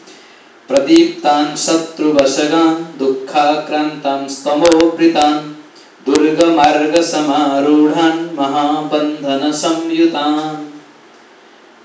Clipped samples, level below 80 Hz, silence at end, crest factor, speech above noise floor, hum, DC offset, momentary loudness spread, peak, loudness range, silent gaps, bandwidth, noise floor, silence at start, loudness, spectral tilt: under 0.1%; -54 dBFS; 1.05 s; 14 dB; 30 dB; none; under 0.1%; 8 LU; 0 dBFS; 3 LU; none; 8 kHz; -43 dBFS; 0.05 s; -13 LUFS; -4 dB/octave